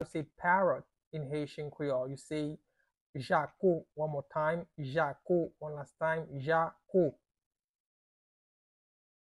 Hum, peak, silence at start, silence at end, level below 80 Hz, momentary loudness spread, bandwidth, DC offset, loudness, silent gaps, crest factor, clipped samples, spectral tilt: none; -16 dBFS; 0 s; 2.25 s; -70 dBFS; 12 LU; 11.5 kHz; under 0.1%; -34 LUFS; 1.07-1.11 s, 3.01-3.13 s; 20 dB; under 0.1%; -7.5 dB/octave